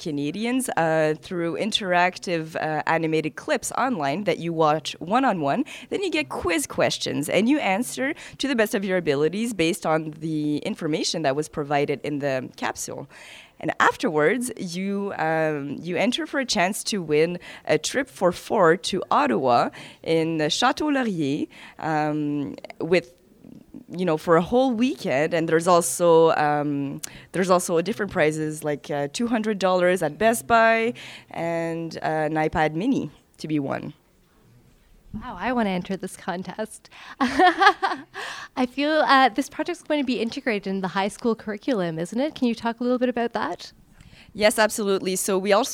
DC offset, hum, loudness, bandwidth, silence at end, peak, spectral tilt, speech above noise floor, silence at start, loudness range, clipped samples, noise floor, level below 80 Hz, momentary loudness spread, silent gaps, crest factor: under 0.1%; none; -23 LUFS; 17.5 kHz; 0 s; 0 dBFS; -4.5 dB/octave; 35 dB; 0 s; 5 LU; under 0.1%; -58 dBFS; -56 dBFS; 12 LU; none; 22 dB